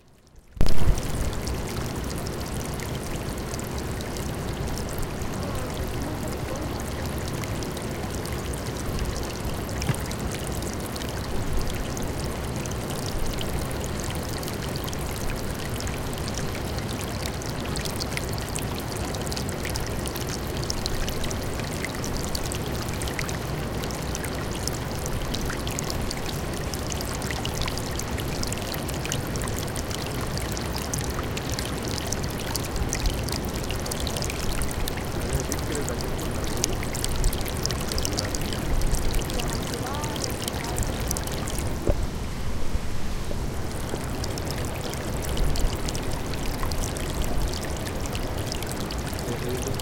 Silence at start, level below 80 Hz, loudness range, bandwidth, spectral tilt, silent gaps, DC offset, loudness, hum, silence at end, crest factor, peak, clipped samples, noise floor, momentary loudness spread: 0.35 s; -32 dBFS; 3 LU; 17 kHz; -4.5 dB/octave; none; under 0.1%; -29 LUFS; none; 0 s; 26 dB; 0 dBFS; under 0.1%; -51 dBFS; 3 LU